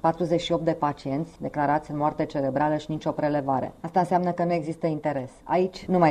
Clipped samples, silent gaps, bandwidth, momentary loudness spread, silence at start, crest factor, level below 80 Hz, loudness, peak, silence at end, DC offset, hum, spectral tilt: under 0.1%; none; 10.5 kHz; 6 LU; 0.05 s; 18 dB; -54 dBFS; -26 LUFS; -8 dBFS; 0 s; under 0.1%; none; -7.5 dB/octave